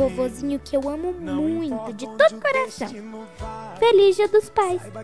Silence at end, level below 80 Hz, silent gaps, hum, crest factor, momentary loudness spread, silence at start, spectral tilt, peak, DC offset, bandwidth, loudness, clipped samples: 0 s; -48 dBFS; none; none; 18 dB; 18 LU; 0 s; -5 dB/octave; -4 dBFS; 0.3%; 11 kHz; -21 LUFS; under 0.1%